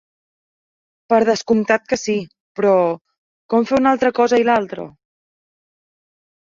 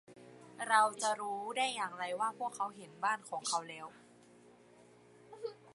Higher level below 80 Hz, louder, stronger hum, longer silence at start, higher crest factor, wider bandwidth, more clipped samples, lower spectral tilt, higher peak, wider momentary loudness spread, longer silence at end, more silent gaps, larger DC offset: first, -58 dBFS vs -88 dBFS; first, -17 LUFS vs -36 LUFS; neither; first, 1.1 s vs 0.1 s; second, 18 dB vs 24 dB; second, 7.6 kHz vs 11.5 kHz; neither; first, -5 dB/octave vs -1 dB/octave; first, -2 dBFS vs -14 dBFS; second, 14 LU vs 18 LU; first, 1.6 s vs 0 s; first, 2.40-2.55 s, 3.01-3.05 s, 3.18-3.49 s vs none; neither